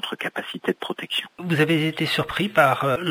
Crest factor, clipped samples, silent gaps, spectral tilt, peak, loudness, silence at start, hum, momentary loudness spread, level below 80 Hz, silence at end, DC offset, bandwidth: 20 dB; under 0.1%; none; -5.5 dB/octave; -4 dBFS; -23 LUFS; 0.05 s; none; 10 LU; -58 dBFS; 0 s; under 0.1%; 16 kHz